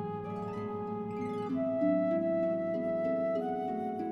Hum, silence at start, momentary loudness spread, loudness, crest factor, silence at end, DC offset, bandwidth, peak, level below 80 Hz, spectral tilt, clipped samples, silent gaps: none; 0 s; 8 LU; -33 LUFS; 14 dB; 0 s; under 0.1%; 6.2 kHz; -20 dBFS; -68 dBFS; -9.5 dB/octave; under 0.1%; none